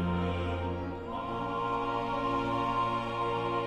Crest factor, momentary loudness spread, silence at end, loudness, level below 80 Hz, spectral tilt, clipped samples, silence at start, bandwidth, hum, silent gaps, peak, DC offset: 12 dB; 6 LU; 0 s; -32 LUFS; -48 dBFS; -7.5 dB/octave; under 0.1%; 0 s; 11 kHz; none; none; -20 dBFS; under 0.1%